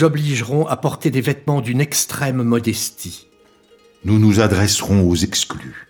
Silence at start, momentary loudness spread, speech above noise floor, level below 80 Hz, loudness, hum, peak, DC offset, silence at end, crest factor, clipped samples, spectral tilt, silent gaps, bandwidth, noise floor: 0 s; 10 LU; 34 dB; -44 dBFS; -17 LUFS; none; 0 dBFS; under 0.1%; 0.05 s; 16 dB; under 0.1%; -5 dB/octave; none; 19 kHz; -51 dBFS